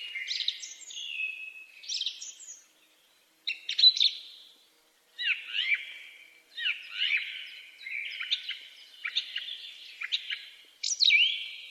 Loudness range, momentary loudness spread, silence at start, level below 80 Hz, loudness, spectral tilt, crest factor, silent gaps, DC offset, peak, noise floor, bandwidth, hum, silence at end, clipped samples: 8 LU; 23 LU; 0 s; under -90 dBFS; -28 LUFS; 7 dB/octave; 24 dB; none; under 0.1%; -10 dBFS; -65 dBFS; 14.5 kHz; none; 0 s; under 0.1%